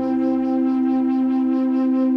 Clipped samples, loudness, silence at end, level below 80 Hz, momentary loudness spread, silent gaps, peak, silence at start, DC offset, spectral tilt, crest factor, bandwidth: under 0.1%; -20 LUFS; 0 s; -58 dBFS; 1 LU; none; -12 dBFS; 0 s; under 0.1%; -8.5 dB/octave; 8 dB; 5 kHz